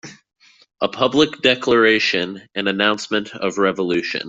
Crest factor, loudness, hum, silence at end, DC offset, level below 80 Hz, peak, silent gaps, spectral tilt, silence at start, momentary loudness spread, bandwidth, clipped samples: 18 dB; -18 LUFS; none; 0 s; under 0.1%; -58 dBFS; -2 dBFS; none; -4 dB/octave; 0.05 s; 10 LU; 8 kHz; under 0.1%